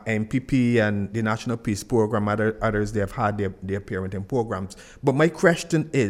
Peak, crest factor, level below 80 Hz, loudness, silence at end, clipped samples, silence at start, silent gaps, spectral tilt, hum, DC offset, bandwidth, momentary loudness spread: -4 dBFS; 20 dB; -46 dBFS; -24 LUFS; 0 s; under 0.1%; 0 s; none; -6.5 dB/octave; none; under 0.1%; 15 kHz; 9 LU